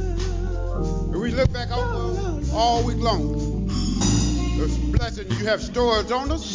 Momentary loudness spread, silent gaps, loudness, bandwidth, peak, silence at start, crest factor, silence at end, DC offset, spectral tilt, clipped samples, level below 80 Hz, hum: 6 LU; none; -23 LUFS; 7.6 kHz; -6 dBFS; 0 s; 16 dB; 0 s; under 0.1%; -5.5 dB/octave; under 0.1%; -28 dBFS; none